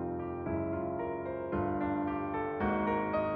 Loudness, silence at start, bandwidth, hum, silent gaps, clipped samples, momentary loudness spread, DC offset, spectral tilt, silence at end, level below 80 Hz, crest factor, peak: -34 LUFS; 0 s; 4.8 kHz; none; none; under 0.1%; 5 LU; under 0.1%; -10.5 dB/octave; 0 s; -52 dBFS; 14 dB; -20 dBFS